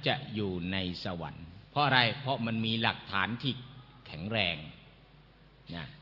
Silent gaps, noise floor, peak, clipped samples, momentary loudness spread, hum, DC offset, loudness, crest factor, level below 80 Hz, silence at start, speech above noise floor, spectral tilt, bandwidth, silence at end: none; -58 dBFS; -8 dBFS; under 0.1%; 19 LU; none; under 0.1%; -31 LUFS; 26 dB; -62 dBFS; 0 s; 26 dB; -7 dB/octave; 6 kHz; 0 s